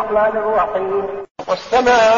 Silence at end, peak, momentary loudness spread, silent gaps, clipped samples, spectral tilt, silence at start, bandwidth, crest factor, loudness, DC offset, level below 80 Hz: 0 s; -2 dBFS; 11 LU; 1.31-1.35 s; under 0.1%; -1.5 dB/octave; 0 s; 7.4 kHz; 12 dB; -17 LUFS; under 0.1%; -48 dBFS